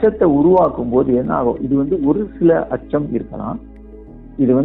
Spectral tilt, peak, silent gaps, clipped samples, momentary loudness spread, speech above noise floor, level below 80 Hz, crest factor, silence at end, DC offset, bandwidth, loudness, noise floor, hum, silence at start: -12 dB/octave; -2 dBFS; none; under 0.1%; 13 LU; 21 dB; -38 dBFS; 14 dB; 0 s; under 0.1%; 3.9 kHz; -16 LUFS; -37 dBFS; none; 0 s